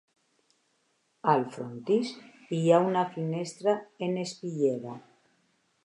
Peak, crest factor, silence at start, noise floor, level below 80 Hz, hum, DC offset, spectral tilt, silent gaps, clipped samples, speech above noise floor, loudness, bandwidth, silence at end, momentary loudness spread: -10 dBFS; 20 dB; 1.25 s; -73 dBFS; -82 dBFS; none; under 0.1%; -6.5 dB/octave; none; under 0.1%; 45 dB; -29 LUFS; 11 kHz; 0.85 s; 14 LU